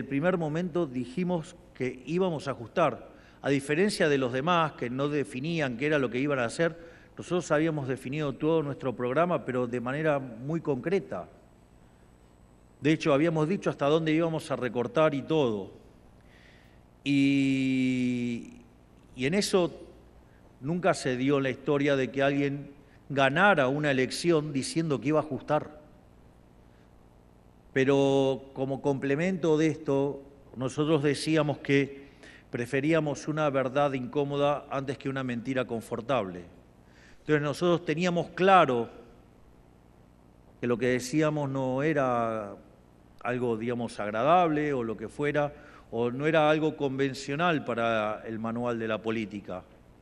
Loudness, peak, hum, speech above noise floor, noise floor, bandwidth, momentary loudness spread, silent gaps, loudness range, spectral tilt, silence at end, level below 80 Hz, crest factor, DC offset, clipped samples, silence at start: -28 LUFS; -6 dBFS; 60 Hz at -60 dBFS; 29 dB; -57 dBFS; 12.5 kHz; 10 LU; none; 4 LU; -6 dB/octave; 0.4 s; -60 dBFS; 22 dB; under 0.1%; under 0.1%; 0 s